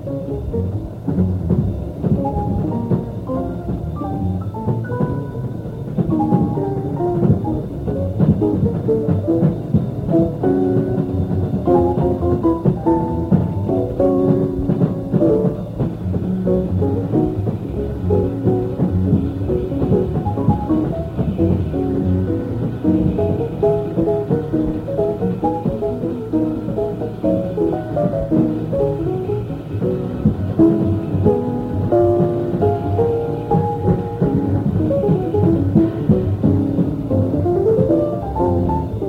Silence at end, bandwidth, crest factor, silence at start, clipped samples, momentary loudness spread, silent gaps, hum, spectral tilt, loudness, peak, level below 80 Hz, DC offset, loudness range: 0 s; 5.4 kHz; 16 dB; 0 s; under 0.1%; 7 LU; none; none; -11 dB/octave; -19 LUFS; -2 dBFS; -34 dBFS; under 0.1%; 4 LU